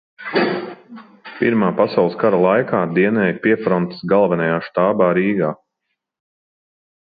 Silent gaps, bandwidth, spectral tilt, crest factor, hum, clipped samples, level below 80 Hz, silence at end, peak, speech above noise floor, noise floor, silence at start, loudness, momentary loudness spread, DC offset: none; 5 kHz; -10.5 dB/octave; 16 dB; none; under 0.1%; -60 dBFS; 1.45 s; -2 dBFS; 60 dB; -76 dBFS; 0.2 s; -17 LUFS; 8 LU; under 0.1%